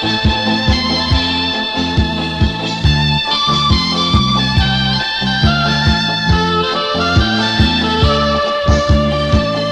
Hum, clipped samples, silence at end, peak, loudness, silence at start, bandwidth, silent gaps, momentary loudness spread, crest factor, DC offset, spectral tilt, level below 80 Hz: none; under 0.1%; 0 s; 0 dBFS; -13 LUFS; 0 s; 9.8 kHz; none; 3 LU; 14 dB; under 0.1%; -5.5 dB/octave; -24 dBFS